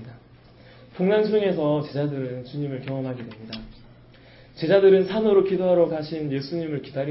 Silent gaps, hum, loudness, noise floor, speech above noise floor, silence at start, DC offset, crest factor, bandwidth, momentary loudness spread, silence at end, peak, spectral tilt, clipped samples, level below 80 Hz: none; none; -23 LUFS; -50 dBFS; 28 dB; 0 s; under 0.1%; 18 dB; 5.8 kHz; 17 LU; 0 s; -6 dBFS; -11.5 dB/octave; under 0.1%; -56 dBFS